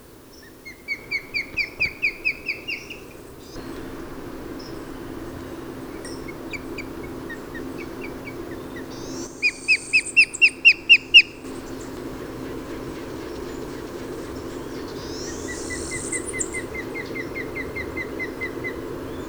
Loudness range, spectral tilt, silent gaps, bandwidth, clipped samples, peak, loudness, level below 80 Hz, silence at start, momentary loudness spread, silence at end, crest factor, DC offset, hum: 18 LU; -2 dB/octave; none; over 20 kHz; under 0.1%; -2 dBFS; -21 LUFS; -46 dBFS; 0 s; 20 LU; 0 s; 24 dB; under 0.1%; none